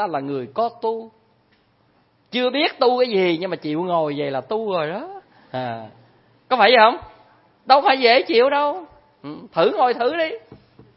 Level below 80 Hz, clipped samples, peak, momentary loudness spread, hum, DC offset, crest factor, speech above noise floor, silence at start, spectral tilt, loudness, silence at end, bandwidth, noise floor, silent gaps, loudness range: -64 dBFS; under 0.1%; 0 dBFS; 18 LU; none; under 0.1%; 20 dB; 41 dB; 0 s; -9 dB/octave; -19 LUFS; 0.4 s; 5.8 kHz; -60 dBFS; none; 6 LU